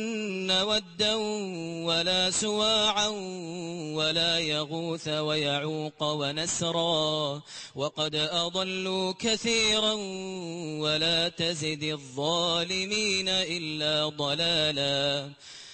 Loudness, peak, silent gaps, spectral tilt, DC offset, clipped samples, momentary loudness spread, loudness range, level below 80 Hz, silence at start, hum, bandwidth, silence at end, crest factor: -27 LUFS; -14 dBFS; none; -3 dB/octave; under 0.1%; under 0.1%; 10 LU; 2 LU; -60 dBFS; 0 s; none; 8.8 kHz; 0 s; 16 dB